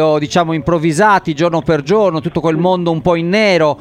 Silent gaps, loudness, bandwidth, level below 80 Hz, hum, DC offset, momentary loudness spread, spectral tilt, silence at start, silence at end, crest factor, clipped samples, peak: none; -13 LUFS; 11.5 kHz; -42 dBFS; none; under 0.1%; 4 LU; -6 dB/octave; 0 s; 0 s; 12 dB; under 0.1%; 0 dBFS